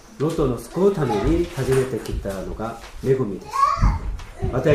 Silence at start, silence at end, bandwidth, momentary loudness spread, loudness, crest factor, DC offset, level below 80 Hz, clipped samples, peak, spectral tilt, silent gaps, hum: 0.1 s; 0 s; 15.5 kHz; 11 LU; -23 LUFS; 16 dB; under 0.1%; -30 dBFS; under 0.1%; -4 dBFS; -7 dB/octave; none; none